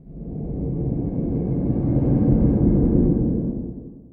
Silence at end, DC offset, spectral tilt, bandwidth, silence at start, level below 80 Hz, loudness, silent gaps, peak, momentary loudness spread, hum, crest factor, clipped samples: 0.05 s; under 0.1%; -16 dB/octave; 2.4 kHz; 0.05 s; -28 dBFS; -21 LUFS; none; -6 dBFS; 14 LU; none; 16 dB; under 0.1%